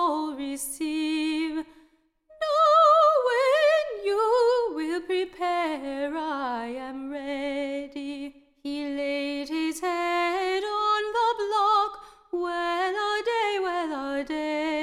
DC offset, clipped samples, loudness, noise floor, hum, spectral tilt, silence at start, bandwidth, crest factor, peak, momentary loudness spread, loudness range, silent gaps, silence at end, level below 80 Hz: under 0.1%; under 0.1%; -26 LUFS; -62 dBFS; none; -2 dB/octave; 0 s; 15.5 kHz; 16 dB; -10 dBFS; 14 LU; 10 LU; none; 0 s; -62 dBFS